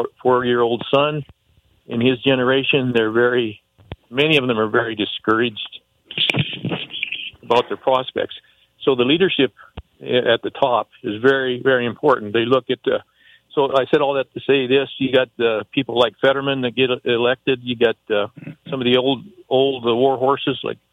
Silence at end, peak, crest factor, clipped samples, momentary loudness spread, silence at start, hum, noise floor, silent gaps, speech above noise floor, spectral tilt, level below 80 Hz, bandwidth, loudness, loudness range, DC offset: 0.2 s; -2 dBFS; 18 dB; under 0.1%; 9 LU; 0 s; none; -59 dBFS; none; 40 dB; -6.5 dB/octave; -56 dBFS; 8.8 kHz; -19 LUFS; 2 LU; under 0.1%